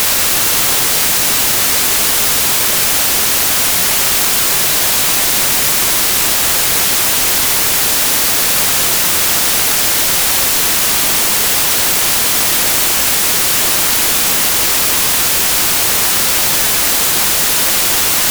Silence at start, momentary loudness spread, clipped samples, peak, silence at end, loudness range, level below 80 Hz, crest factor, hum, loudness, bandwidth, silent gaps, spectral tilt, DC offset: 0 s; 0 LU; under 0.1%; 0 dBFS; 0 s; 0 LU; -38 dBFS; 12 dB; none; -9 LUFS; over 20 kHz; none; 0 dB/octave; under 0.1%